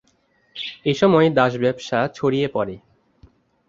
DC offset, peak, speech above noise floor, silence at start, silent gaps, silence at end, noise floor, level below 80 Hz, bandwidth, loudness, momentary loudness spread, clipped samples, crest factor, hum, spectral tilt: under 0.1%; -2 dBFS; 44 dB; 0.55 s; none; 0.9 s; -63 dBFS; -58 dBFS; 7.6 kHz; -20 LUFS; 16 LU; under 0.1%; 20 dB; none; -6.5 dB/octave